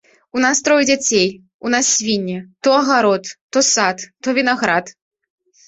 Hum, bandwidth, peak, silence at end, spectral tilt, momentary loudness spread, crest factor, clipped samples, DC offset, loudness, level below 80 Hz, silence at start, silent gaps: none; 8.4 kHz; 0 dBFS; 0.75 s; -2 dB/octave; 8 LU; 16 dB; under 0.1%; under 0.1%; -16 LUFS; -60 dBFS; 0.35 s; 1.54-1.59 s, 3.41-3.49 s